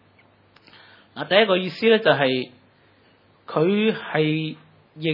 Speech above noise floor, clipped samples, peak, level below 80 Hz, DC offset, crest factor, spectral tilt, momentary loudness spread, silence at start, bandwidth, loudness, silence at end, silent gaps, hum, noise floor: 37 dB; under 0.1%; -2 dBFS; -78 dBFS; under 0.1%; 22 dB; -8 dB/octave; 15 LU; 1.15 s; 5.8 kHz; -21 LUFS; 0 s; none; none; -57 dBFS